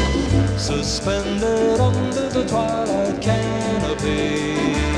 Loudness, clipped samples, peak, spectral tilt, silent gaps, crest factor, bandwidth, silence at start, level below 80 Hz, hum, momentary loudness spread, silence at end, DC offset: -20 LUFS; under 0.1%; -6 dBFS; -5.5 dB/octave; none; 14 dB; 11.5 kHz; 0 s; -30 dBFS; none; 3 LU; 0 s; under 0.1%